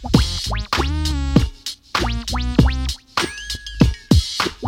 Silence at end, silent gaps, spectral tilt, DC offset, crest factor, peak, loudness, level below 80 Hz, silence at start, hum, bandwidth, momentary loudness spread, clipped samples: 0 s; none; -5 dB/octave; under 0.1%; 18 dB; 0 dBFS; -20 LUFS; -24 dBFS; 0 s; none; 16.5 kHz; 8 LU; under 0.1%